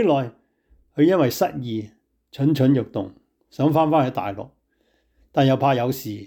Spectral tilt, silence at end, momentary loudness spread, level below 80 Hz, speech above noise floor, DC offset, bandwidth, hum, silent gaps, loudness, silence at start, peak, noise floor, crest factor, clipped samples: -7 dB/octave; 0 s; 17 LU; -60 dBFS; 46 dB; under 0.1%; 19 kHz; none; none; -21 LUFS; 0 s; -6 dBFS; -66 dBFS; 14 dB; under 0.1%